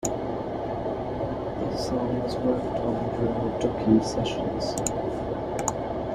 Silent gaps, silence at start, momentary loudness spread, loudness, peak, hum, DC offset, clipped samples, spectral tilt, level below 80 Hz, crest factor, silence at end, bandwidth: none; 0 s; 8 LU; -28 LUFS; -8 dBFS; none; under 0.1%; under 0.1%; -5.5 dB/octave; -44 dBFS; 18 dB; 0 s; 14 kHz